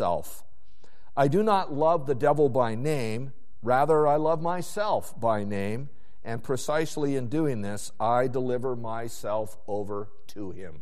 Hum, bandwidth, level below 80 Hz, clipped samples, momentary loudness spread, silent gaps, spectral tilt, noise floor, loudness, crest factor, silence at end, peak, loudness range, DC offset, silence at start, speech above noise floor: none; 14 kHz; -60 dBFS; under 0.1%; 15 LU; none; -6.5 dB/octave; -60 dBFS; -27 LUFS; 18 dB; 0 s; -8 dBFS; 5 LU; 3%; 0 s; 34 dB